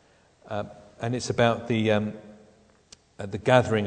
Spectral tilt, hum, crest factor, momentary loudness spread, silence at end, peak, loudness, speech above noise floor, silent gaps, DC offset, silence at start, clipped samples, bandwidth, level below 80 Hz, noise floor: -6 dB/octave; none; 24 dB; 17 LU; 0 s; -2 dBFS; -26 LUFS; 33 dB; none; under 0.1%; 0.45 s; under 0.1%; 9.4 kHz; -60 dBFS; -58 dBFS